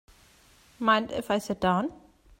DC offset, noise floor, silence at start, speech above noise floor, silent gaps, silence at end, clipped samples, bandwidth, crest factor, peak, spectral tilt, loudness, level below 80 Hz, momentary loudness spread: under 0.1%; -59 dBFS; 0.8 s; 32 dB; none; 0.45 s; under 0.1%; 16 kHz; 20 dB; -8 dBFS; -5.5 dB/octave; -27 LUFS; -58 dBFS; 5 LU